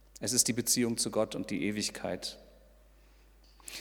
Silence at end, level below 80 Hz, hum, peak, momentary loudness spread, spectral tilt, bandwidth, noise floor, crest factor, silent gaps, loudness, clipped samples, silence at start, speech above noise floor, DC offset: 0 s; -60 dBFS; none; -10 dBFS; 16 LU; -2.5 dB/octave; 19 kHz; -60 dBFS; 24 dB; none; -31 LUFS; under 0.1%; 0.15 s; 28 dB; under 0.1%